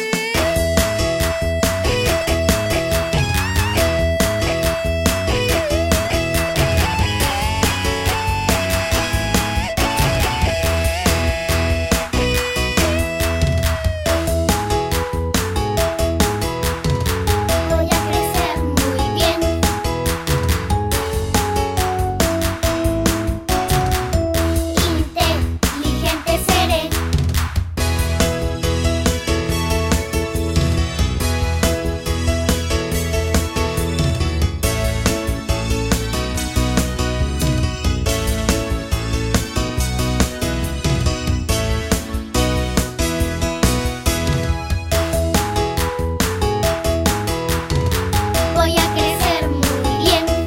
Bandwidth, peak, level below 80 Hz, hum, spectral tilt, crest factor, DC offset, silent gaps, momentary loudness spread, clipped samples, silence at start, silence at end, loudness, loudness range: 16.5 kHz; 0 dBFS; -24 dBFS; none; -4.5 dB/octave; 18 dB; under 0.1%; none; 4 LU; under 0.1%; 0 s; 0 s; -19 LUFS; 2 LU